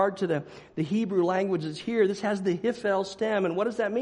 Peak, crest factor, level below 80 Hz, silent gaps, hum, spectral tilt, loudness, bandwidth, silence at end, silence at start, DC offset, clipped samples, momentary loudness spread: -10 dBFS; 16 dB; -66 dBFS; none; none; -6.5 dB/octave; -27 LUFS; 10.5 kHz; 0 s; 0 s; under 0.1%; under 0.1%; 5 LU